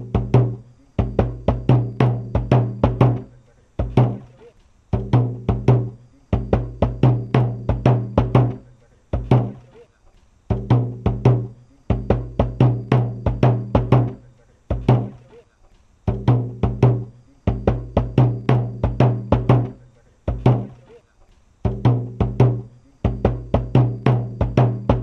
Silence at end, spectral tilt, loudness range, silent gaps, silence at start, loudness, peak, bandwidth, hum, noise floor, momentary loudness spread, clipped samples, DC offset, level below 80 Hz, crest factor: 0 s; -10 dB/octave; 3 LU; none; 0 s; -20 LUFS; 0 dBFS; 5.8 kHz; none; -53 dBFS; 10 LU; under 0.1%; under 0.1%; -32 dBFS; 18 dB